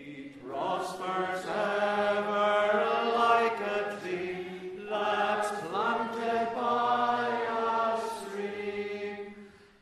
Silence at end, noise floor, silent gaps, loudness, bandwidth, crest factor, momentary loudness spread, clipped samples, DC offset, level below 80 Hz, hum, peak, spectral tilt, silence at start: 0.25 s; -51 dBFS; none; -30 LUFS; 13.5 kHz; 18 dB; 11 LU; under 0.1%; under 0.1%; -70 dBFS; none; -12 dBFS; -4.5 dB/octave; 0 s